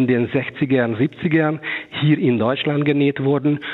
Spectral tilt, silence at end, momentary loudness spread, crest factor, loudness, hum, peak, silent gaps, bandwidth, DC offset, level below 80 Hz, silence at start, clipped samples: -9.5 dB/octave; 0 s; 4 LU; 14 dB; -19 LUFS; none; -4 dBFS; none; 4.2 kHz; under 0.1%; -62 dBFS; 0 s; under 0.1%